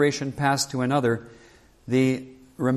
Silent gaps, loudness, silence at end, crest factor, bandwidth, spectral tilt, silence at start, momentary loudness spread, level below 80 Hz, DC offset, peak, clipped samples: none; -24 LUFS; 0 s; 16 dB; 14 kHz; -5 dB/octave; 0 s; 9 LU; -58 dBFS; under 0.1%; -8 dBFS; under 0.1%